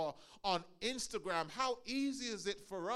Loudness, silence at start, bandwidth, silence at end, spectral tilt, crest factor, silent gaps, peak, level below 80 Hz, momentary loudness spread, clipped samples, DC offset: -40 LUFS; 0 s; 14 kHz; 0 s; -3 dB/octave; 20 dB; none; -20 dBFS; -68 dBFS; 5 LU; under 0.1%; under 0.1%